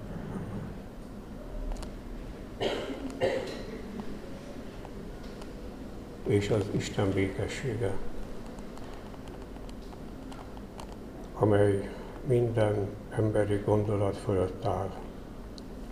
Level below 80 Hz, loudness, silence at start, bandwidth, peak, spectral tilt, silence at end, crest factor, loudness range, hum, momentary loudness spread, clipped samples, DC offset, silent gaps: -44 dBFS; -32 LUFS; 0 s; 15 kHz; -10 dBFS; -7 dB/octave; 0 s; 22 dB; 10 LU; none; 16 LU; under 0.1%; 0.2%; none